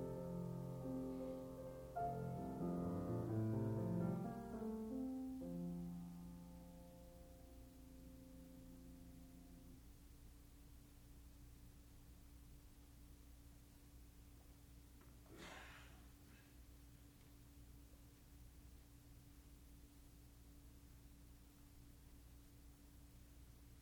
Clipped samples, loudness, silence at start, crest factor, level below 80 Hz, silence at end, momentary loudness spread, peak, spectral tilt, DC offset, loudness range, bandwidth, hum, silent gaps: under 0.1%; -49 LUFS; 0 s; 20 dB; -64 dBFS; 0 s; 20 LU; -32 dBFS; -8 dB/octave; under 0.1%; 19 LU; over 20 kHz; none; none